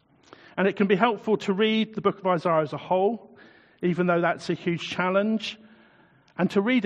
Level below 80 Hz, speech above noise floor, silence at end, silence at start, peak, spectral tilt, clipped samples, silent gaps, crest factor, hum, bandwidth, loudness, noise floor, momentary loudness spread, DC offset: -70 dBFS; 34 dB; 0 s; 0.55 s; -4 dBFS; -6.5 dB/octave; under 0.1%; none; 20 dB; none; 9.2 kHz; -25 LUFS; -58 dBFS; 7 LU; under 0.1%